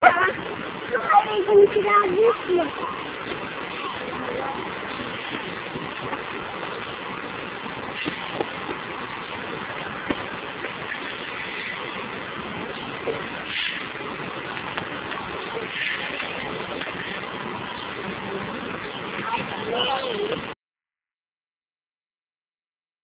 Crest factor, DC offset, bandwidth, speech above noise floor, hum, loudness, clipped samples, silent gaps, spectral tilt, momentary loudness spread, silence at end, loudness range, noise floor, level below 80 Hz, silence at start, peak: 24 dB; under 0.1%; 4 kHz; over 70 dB; none; -26 LUFS; under 0.1%; none; -2 dB/octave; 12 LU; 2.5 s; 9 LU; under -90 dBFS; -56 dBFS; 0 s; -2 dBFS